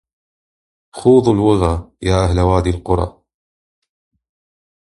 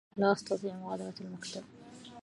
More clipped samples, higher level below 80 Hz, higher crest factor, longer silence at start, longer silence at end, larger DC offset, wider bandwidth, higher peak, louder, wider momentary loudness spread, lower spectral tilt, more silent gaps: neither; first, -28 dBFS vs -76 dBFS; second, 16 dB vs 22 dB; first, 0.95 s vs 0.15 s; first, 1.8 s vs 0 s; neither; about the same, 11.5 kHz vs 11.5 kHz; first, 0 dBFS vs -14 dBFS; first, -15 LUFS vs -35 LUFS; second, 8 LU vs 21 LU; first, -7.5 dB/octave vs -5.5 dB/octave; neither